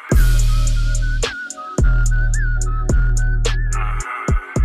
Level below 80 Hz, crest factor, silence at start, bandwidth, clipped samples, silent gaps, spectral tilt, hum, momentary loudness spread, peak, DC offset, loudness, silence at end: -16 dBFS; 12 dB; 0 s; 14 kHz; under 0.1%; none; -5 dB/octave; none; 6 LU; -4 dBFS; 2%; -20 LUFS; 0 s